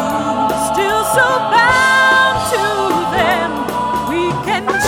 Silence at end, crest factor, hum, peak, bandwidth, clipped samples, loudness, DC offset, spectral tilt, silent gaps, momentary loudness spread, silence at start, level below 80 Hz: 0 s; 12 dB; none; -2 dBFS; 18 kHz; under 0.1%; -14 LUFS; under 0.1%; -3.5 dB/octave; none; 8 LU; 0 s; -40 dBFS